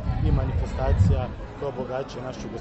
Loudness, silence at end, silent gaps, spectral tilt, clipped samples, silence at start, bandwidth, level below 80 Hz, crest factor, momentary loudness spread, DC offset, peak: -26 LUFS; 0 s; none; -8 dB/octave; under 0.1%; 0 s; 8.2 kHz; -30 dBFS; 16 dB; 12 LU; under 0.1%; -8 dBFS